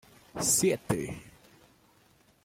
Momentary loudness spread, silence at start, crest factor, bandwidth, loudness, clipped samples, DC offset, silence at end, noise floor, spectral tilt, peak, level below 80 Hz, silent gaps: 20 LU; 0.35 s; 20 dB; 16.5 kHz; -28 LUFS; under 0.1%; under 0.1%; 1.15 s; -64 dBFS; -3.5 dB/octave; -12 dBFS; -60 dBFS; none